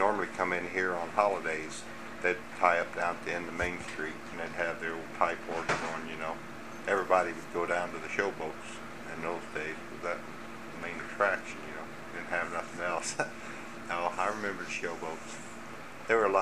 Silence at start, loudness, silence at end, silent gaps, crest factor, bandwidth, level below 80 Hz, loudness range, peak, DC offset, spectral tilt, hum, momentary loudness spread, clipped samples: 0 s; -33 LUFS; 0 s; none; 24 dB; 15.5 kHz; -62 dBFS; 5 LU; -10 dBFS; 0.4%; -4 dB/octave; none; 14 LU; under 0.1%